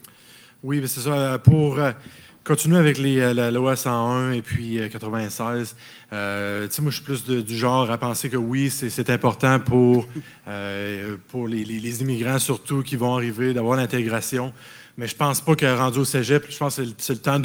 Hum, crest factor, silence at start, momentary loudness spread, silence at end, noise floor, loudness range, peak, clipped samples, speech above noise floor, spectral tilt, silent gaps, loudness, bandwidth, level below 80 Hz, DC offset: none; 22 dB; 0.65 s; 13 LU; 0 s; -50 dBFS; 5 LU; 0 dBFS; under 0.1%; 28 dB; -5.5 dB/octave; none; -22 LUFS; over 20 kHz; -52 dBFS; under 0.1%